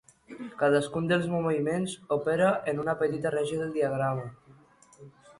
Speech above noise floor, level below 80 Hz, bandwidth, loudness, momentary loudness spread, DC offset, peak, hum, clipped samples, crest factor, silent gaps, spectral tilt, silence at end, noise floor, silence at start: 30 dB; -64 dBFS; 11.5 kHz; -28 LUFS; 10 LU; under 0.1%; -12 dBFS; none; under 0.1%; 16 dB; none; -6 dB/octave; 0.05 s; -57 dBFS; 0.3 s